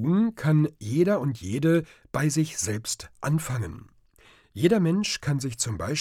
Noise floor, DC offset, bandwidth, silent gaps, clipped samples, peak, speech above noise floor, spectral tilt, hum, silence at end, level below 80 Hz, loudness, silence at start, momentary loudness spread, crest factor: -57 dBFS; under 0.1%; 15.5 kHz; none; under 0.1%; -8 dBFS; 32 dB; -5.5 dB/octave; none; 0 s; -56 dBFS; -26 LUFS; 0 s; 9 LU; 18 dB